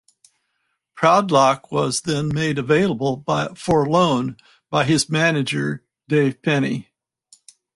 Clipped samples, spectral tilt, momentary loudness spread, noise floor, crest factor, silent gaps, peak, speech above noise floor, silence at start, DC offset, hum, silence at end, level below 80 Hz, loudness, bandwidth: under 0.1%; -5 dB/octave; 8 LU; -73 dBFS; 18 dB; none; -2 dBFS; 54 dB; 0.95 s; under 0.1%; none; 0.95 s; -54 dBFS; -19 LUFS; 11.5 kHz